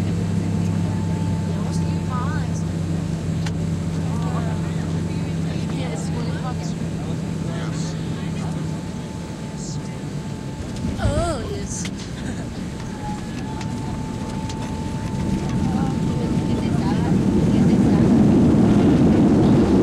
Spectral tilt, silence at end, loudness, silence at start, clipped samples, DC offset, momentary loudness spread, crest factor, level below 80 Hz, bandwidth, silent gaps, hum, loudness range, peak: -7 dB/octave; 0 s; -22 LUFS; 0 s; under 0.1%; under 0.1%; 14 LU; 16 dB; -36 dBFS; 12 kHz; none; none; 10 LU; -4 dBFS